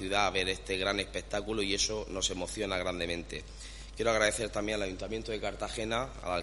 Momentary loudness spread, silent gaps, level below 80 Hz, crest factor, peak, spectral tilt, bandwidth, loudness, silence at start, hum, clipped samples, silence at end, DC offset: 9 LU; none; -46 dBFS; 22 dB; -12 dBFS; -3 dB/octave; 11.5 kHz; -33 LUFS; 0 s; none; under 0.1%; 0 s; under 0.1%